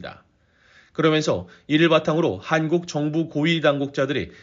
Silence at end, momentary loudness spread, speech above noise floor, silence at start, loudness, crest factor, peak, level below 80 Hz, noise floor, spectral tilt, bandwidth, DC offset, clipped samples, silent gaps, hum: 0.1 s; 7 LU; 35 dB; 0 s; -21 LUFS; 18 dB; -4 dBFS; -58 dBFS; -57 dBFS; -4.5 dB/octave; 7.6 kHz; under 0.1%; under 0.1%; none; none